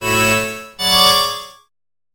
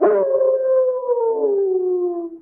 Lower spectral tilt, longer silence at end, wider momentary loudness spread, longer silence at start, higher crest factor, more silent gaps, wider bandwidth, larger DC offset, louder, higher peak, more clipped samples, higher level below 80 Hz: second, -2 dB/octave vs -11.5 dB/octave; first, 0.65 s vs 0.05 s; first, 13 LU vs 4 LU; about the same, 0 s vs 0 s; about the same, 18 dB vs 14 dB; neither; first, over 20 kHz vs 2.6 kHz; neither; first, -14 LUFS vs -19 LUFS; first, 0 dBFS vs -4 dBFS; neither; first, -44 dBFS vs -72 dBFS